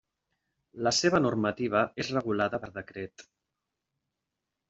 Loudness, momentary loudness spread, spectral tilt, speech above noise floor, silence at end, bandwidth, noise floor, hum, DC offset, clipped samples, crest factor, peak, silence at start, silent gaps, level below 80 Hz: -28 LUFS; 16 LU; -4.5 dB/octave; 57 dB; 1.45 s; 8.2 kHz; -86 dBFS; none; under 0.1%; under 0.1%; 22 dB; -10 dBFS; 0.75 s; none; -64 dBFS